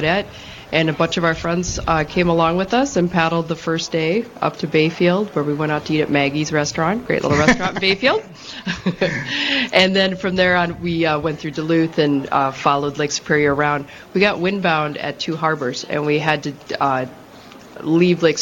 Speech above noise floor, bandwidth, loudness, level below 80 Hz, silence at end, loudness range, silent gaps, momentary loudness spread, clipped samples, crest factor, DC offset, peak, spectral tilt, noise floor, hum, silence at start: 22 dB; 17 kHz; -18 LUFS; -44 dBFS; 0 s; 2 LU; none; 8 LU; under 0.1%; 18 dB; under 0.1%; 0 dBFS; -5 dB/octave; -41 dBFS; none; 0 s